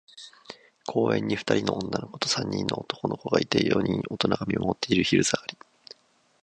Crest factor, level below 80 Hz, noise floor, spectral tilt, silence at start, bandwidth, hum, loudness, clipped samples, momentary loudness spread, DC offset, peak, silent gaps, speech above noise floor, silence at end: 22 dB; -56 dBFS; -57 dBFS; -4.5 dB/octave; 0.15 s; 10.5 kHz; none; -26 LUFS; under 0.1%; 17 LU; under 0.1%; -4 dBFS; none; 31 dB; 0.9 s